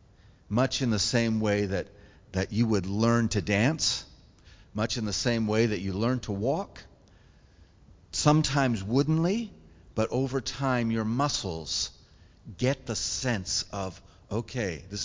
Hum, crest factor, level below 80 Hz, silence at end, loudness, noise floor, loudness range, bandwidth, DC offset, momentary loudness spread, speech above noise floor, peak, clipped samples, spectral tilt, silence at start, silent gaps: none; 22 dB; -50 dBFS; 0 s; -28 LUFS; -57 dBFS; 3 LU; 7.8 kHz; under 0.1%; 10 LU; 29 dB; -8 dBFS; under 0.1%; -5 dB/octave; 0.5 s; none